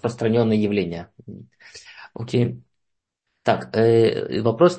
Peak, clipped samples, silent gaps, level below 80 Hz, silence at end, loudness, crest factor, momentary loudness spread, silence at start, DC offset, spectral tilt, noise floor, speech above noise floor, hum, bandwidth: -2 dBFS; under 0.1%; none; -58 dBFS; 0 s; -21 LUFS; 18 dB; 23 LU; 0 s; under 0.1%; -7.5 dB/octave; -78 dBFS; 58 dB; none; 8.8 kHz